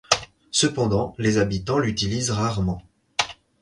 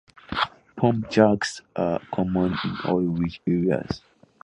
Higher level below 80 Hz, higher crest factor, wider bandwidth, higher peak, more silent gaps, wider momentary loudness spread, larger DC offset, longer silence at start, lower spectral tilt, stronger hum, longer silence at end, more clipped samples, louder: first, -44 dBFS vs -50 dBFS; about the same, 24 dB vs 20 dB; about the same, 11.5 kHz vs 10.5 kHz; first, 0 dBFS vs -4 dBFS; neither; about the same, 7 LU vs 9 LU; neither; second, 0.1 s vs 0.3 s; second, -4 dB/octave vs -6.5 dB/octave; neither; second, 0.3 s vs 0.45 s; neither; about the same, -23 LUFS vs -24 LUFS